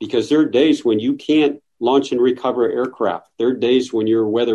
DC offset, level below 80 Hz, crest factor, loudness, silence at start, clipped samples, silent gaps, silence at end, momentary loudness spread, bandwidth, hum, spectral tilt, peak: under 0.1%; -60 dBFS; 14 dB; -18 LUFS; 0 s; under 0.1%; none; 0 s; 6 LU; 10 kHz; none; -5.5 dB/octave; -4 dBFS